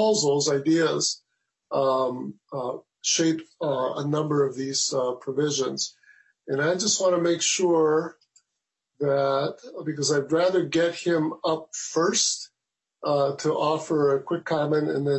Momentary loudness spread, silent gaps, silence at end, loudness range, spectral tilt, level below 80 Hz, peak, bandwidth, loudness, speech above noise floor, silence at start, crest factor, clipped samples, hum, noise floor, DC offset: 10 LU; none; 0 s; 2 LU; -3.5 dB/octave; -74 dBFS; -10 dBFS; 8.4 kHz; -24 LUFS; 61 dB; 0 s; 14 dB; under 0.1%; none; -86 dBFS; under 0.1%